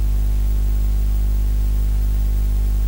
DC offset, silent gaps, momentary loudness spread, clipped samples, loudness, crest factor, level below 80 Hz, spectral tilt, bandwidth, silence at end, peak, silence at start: under 0.1%; none; 0 LU; under 0.1%; -21 LUFS; 6 dB; -18 dBFS; -7 dB/octave; 16 kHz; 0 s; -10 dBFS; 0 s